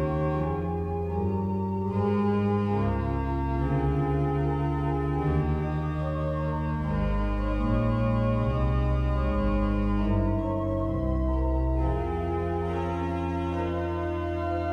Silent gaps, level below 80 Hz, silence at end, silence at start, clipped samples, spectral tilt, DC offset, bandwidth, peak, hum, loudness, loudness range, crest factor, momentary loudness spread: none; -32 dBFS; 0 s; 0 s; under 0.1%; -9.5 dB/octave; under 0.1%; 6.2 kHz; -14 dBFS; none; -28 LUFS; 2 LU; 14 dB; 4 LU